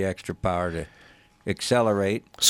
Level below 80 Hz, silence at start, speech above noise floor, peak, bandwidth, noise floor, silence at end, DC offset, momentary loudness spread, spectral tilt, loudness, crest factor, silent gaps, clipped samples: -50 dBFS; 0 s; 30 dB; -4 dBFS; 17 kHz; -55 dBFS; 0 s; under 0.1%; 14 LU; -3.5 dB/octave; -26 LUFS; 22 dB; none; under 0.1%